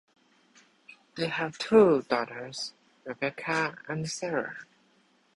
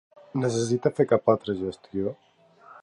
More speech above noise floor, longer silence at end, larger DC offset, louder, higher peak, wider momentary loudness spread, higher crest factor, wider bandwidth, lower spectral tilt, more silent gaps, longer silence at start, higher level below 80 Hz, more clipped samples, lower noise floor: first, 38 dB vs 27 dB; first, 0.75 s vs 0.05 s; neither; about the same, -28 LUFS vs -26 LUFS; about the same, -8 dBFS vs -6 dBFS; first, 19 LU vs 10 LU; about the same, 22 dB vs 20 dB; about the same, 11.5 kHz vs 11 kHz; second, -5 dB/octave vs -6.5 dB/octave; neither; first, 1.15 s vs 0.35 s; second, -68 dBFS vs -60 dBFS; neither; first, -66 dBFS vs -52 dBFS